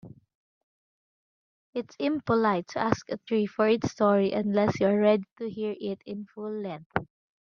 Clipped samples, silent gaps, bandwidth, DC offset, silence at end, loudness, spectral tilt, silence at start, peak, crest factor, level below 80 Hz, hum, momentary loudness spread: under 0.1%; 0.35-1.73 s, 5.31-5.36 s, 6.86-6.90 s; 7 kHz; under 0.1%; 0.5 s; -28 LUFS; -6.5 dB/octave; 0.05 s; -8 dBFS; 20 dB; -64 dBFS; none; 13 LU